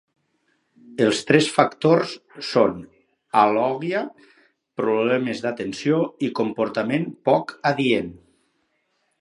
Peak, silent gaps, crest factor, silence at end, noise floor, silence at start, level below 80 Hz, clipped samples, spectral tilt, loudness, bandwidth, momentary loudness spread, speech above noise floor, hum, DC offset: 0 dBFS; none; 22 dB; 1.05 s; -70 dBFS; 0.85 s; -62 dBFS; under 0.1%; -5.5 dB/octave; -21 LUFS; 11.5 kHz; 10 LU; 49 dB; none; under 0.1%